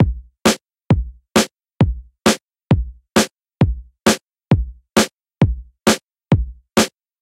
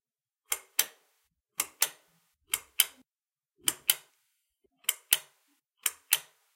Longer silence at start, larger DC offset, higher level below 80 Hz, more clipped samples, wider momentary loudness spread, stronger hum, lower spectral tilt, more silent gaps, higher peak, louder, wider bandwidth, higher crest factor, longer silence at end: second, 0 s vs 0.5 s; neither; first, -30 dBFS vs -80 dBFS; neither; second, 4 LU vs 8 LU; neither; first, -5 dB/octave vs 3 dB/octave; first, 6.03-6.07 s vs none; about the same, 0 dBFS vs -2 dBFS; first, -19 LUFS vs -30 LUFS; about the same, 16.5 kHz vs 17 kHz; second, 18 dB vs 34 dB; about the same, 0.35 s vs 0.35 s